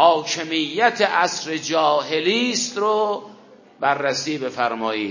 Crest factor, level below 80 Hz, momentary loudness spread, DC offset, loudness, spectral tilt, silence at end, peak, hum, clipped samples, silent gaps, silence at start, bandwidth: 20 dB; -72 dBFS; 6 LU; under 0.1%; -21 LUFS; -2.5 dB/octave; 0 s; 0 dBFS; none; under 0.1%; none; 0 s; 7.4 kHz